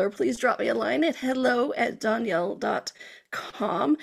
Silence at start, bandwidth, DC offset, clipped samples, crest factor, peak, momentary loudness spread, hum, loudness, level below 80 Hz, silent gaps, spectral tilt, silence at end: 0 s; 14.5 kHz; under 0.1%; under 0.1%; 16 dB; -10 dBFS; 12 LU; none; -26 LUFS; -66 dBFS; none; -4.5 dB/octave; 0 s